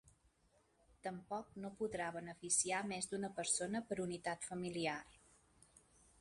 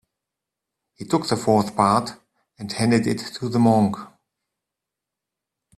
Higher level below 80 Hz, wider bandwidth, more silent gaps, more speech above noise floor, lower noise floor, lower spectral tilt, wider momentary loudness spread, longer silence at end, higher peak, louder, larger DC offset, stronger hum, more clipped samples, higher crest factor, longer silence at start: second, -74 dBFS vs -58 dBFS; second, 11.5 kHz vs 13 kHz; neither; second, 33 dB vs 65 dB; second, -76 dBFS vs -85 dBFS; second, -3 dB/octave vs -6 dB/octave; second, 13 LU vs 17 LU; second, 1.05 s vs 1.7 s; second, -24 dBFS vs -2 dBFS; second, -42 LUFS vs -21 LUFS; neither; neither; neither; about the same, 22 dB vs 22 dB; second, 0.05 s vs 1 s